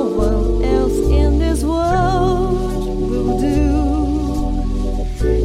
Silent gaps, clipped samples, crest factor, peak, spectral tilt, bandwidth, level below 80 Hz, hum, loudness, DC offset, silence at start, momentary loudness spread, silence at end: none; under 0.1%; 12 dB; -4 dBFS; -7.5 dB/octave; 14 kHz; -20 dBFS; none; -18 LUFS; under 0.1%; 0 s; 6 LU; 0 s